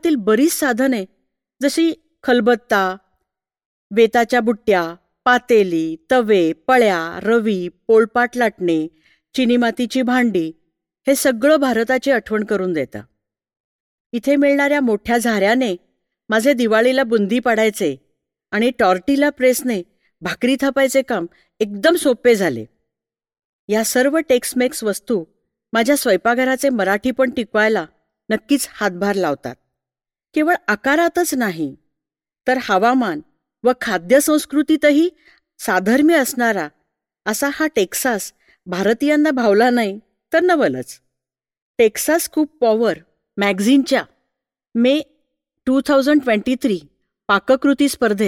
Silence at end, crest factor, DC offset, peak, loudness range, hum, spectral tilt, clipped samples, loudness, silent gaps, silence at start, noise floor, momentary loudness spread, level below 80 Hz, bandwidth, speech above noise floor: 0 s; 16 dB; under 0.1%; -2 dBFS; 3 LU; none; -4 dB/octave; under 0.1%; -17 LUFS; 3.65-3.90 s, 13.60-14.10 s, 23.45-23.68 s, 41.62-41.74 s; 0.05 s; -89 dBFS; 10 LU; -58 dBFS; 17.5 kHz; 73 dB